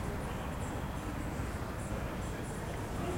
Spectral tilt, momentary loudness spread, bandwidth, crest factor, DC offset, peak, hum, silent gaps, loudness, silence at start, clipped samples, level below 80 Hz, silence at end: -6 dB/octave; 1 LU; 16.5 kHz; 12 dB; under 0.1%; -24 dBFS; none; none; -39 LUFS; 0 s; under 0.1%; -44 dBFS; 0 s